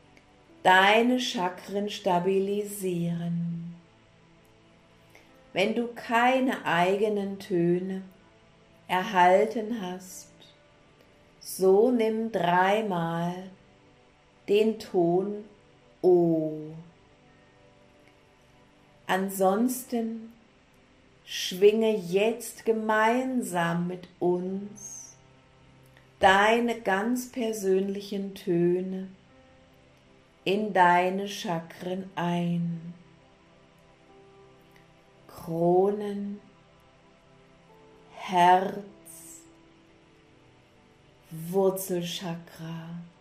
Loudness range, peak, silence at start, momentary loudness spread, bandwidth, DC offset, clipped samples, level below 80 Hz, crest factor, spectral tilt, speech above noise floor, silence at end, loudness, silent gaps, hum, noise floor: 7 LU; -8 dBFS; 0.65 s; 19 LU; 15.5 kHz; under 0.1%; under 0.1%; -66 dBFS; 22 dB; -5 dB/octave; 33 dB; 0.15 s; -26 LUFS; none; none; -59 dBFS